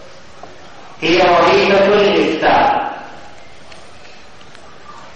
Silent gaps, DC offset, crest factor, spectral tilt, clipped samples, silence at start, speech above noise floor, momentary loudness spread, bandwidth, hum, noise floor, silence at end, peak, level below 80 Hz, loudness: none; 2%; 14 dB; -5 dB/octave; under 0.1%; 0.45 s; 29 dB; 13 LU; 9 kHz; none; -40 dBFS; 0.1 s; -2 dBFS; -46 dBFS; -12 LUFS